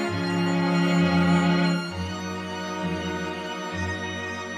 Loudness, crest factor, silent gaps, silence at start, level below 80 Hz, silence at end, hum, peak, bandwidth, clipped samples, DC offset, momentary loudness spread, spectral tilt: -25 LUFS; 14 dB; none; 0 s; -52 dBFS; 0 s; none; -10 dBFS; 10.5 kHz; under 0.1%; under 0.1%; 10 LU; -6 dB/octave